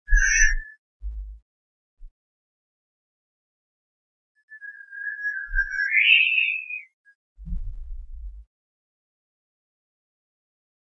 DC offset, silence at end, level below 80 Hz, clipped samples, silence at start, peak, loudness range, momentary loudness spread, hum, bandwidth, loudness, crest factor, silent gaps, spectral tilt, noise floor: under 0.1%; 2.55 s; -34 dBFS; under 0.1%; 0.1 s; -4 dBFS; 22 LU; 26 LU; none; 6.8 kHz; -20 LUFS; 22 dB; 0.79-1.00 s, 1.42-1.97 s, 2.11-4.35 s, 4.43-4.48 s, 6.93-7.04 s, 7.15-7.36 s; 1 dB/octave; under -90 dBFS